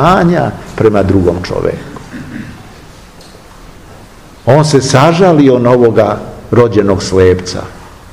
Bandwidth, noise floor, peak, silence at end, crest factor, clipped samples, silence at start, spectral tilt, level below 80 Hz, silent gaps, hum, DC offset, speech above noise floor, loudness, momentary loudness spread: 15.5 kHz; -35 dBFS; 0 dBFS; 0.05 s; 10 dB; 2%; 0 s; -6.5 dB/octave; -34 dBFS; none; none; 0.5%; 26 dB; -9 LUFS; 19 LU